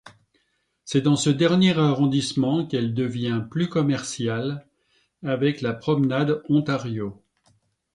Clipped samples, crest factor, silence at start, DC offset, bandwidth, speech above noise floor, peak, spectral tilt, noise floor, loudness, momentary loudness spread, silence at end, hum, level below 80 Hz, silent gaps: under 0.1%; 18 dB; 0.05 s; under 0.1%; 11 kHz; 48 dB; -6 dBFS; -6 dB/octave; -70 dBFS; -23 LUFS; 11 LU; 0.8 s; none; -60 dBFS; none